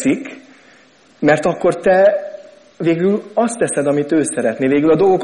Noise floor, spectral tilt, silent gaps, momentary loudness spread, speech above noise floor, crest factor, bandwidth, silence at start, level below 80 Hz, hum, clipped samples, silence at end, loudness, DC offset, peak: -49 dBFS; -5.5 dB/octave; none; 9 LU; 34 dB; 16 dB; 10.5 kHz; 0 s; -56 dBFS; none; under 0.1%; 0 s; -16 LUFS; under 0.1%; 0 dBFS